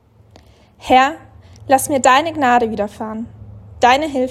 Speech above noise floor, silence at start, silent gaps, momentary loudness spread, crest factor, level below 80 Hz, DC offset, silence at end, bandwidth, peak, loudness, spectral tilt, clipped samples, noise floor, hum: 32 dB; 0.85 s; none; 20 LU; 16 dB; -48 dBFS; under 0.1%; 0 s; 14.5 kHz; 0 dBFS; -15 LUFS; -3.5 dB/octave; under 0.1%; -47 dBFS; none